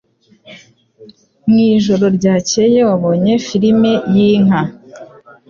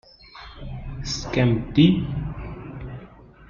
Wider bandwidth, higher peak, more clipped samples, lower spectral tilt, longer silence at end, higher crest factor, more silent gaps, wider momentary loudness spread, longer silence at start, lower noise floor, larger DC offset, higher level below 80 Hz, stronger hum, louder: about the same, 7.4 kHz vs 7.2 kHz; about the same, -2 dBFS vs -4 dBFS; neither; about the same, -6 dB/octave vs -6.5 dB/octave; first, 0.45 s vs 0.05 s; second, 12 dB vs 20 dB; neither; second, 3 LU vs 22 LU; first, 0.5 s vs 0.35 s; about the same, -43 dBFS vs -46 dBFS; neither; second, -52 dBFS vs -40 dBFS; neither; first, -12 LUFS vs -22 LUFS